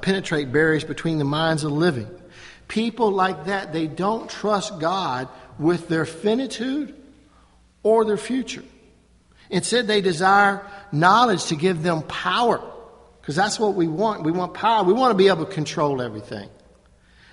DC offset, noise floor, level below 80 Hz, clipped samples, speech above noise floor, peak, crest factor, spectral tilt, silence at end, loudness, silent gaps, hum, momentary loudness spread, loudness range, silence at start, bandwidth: under 0.1%; -55 dBFS; -56 dBFS; under 0.1%; 34 dB; -2 dBFS; 20 dB; -5 dB/octave; 0.85 s; -21 LUFS; none; none; 12 LU; 5 LU; 0 s; 11.5 kHz